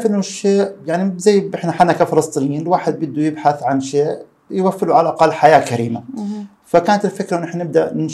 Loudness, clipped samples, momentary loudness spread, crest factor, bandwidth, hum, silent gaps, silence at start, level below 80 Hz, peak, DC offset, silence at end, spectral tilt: -16 LUFS; under 0.1%; 10 LU; 16 dB; 13 kHz; none; none; 0 s; -60 dBFS; 0 dBFS; under 0.1%; 0 s; -6 dB/octave